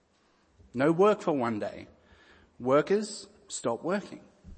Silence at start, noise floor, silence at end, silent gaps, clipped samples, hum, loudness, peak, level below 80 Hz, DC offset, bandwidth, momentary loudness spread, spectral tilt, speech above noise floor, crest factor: 0.75 s; -67 dBFS; 0 s; none; under 0.1%; none; -29 LUFS; -12 dBFS; -64 dBFS; under 0.1%; 8.8 kHz; 18 LU; -5.5 dB/octave; 39 dB; 18 dB